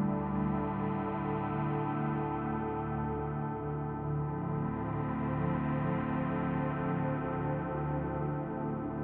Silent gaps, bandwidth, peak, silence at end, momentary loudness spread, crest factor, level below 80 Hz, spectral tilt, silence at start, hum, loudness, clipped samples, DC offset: none; 3.7 kHz; -20 dBFS; 0 s; 3 LU; 12 dB; -50 dBFS; -8.5 dB/octave; 0 s; none; -34 LUFS; under 0.1%; under 0.1%